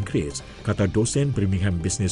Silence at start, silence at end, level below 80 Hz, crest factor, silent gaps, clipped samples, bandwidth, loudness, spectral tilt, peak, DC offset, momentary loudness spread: 0 s; 0 s; -40 dBFS; 14 dB; none; under 0.1%; 11.5 kHz; -24 LUFS; -5.5 dB/octave; -10 dBFS; under 0.1%; 7 LU